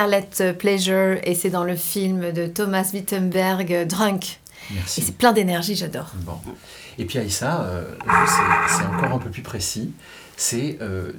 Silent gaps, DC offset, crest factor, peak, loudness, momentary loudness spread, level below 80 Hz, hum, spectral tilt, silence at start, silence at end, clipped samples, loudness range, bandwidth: none; under 0.1%; 18 dB; -2 dBFS; -21 LUFS; 15 LU; -52 dBFS; none; -4 dB/octave; 0 s; 0 s; under 0.1%; 2 LU; over 20 kHz